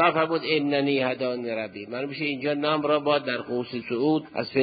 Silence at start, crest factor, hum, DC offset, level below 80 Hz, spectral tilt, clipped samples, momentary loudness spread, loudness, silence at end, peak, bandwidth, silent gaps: 0 s; 18 dB; none; under 0.1%; -68 dBFS; -10 dB/octave; under 0.1%; 8 LU; -26 LUFS; 0 s; -8 dBFS; 5 kHz; none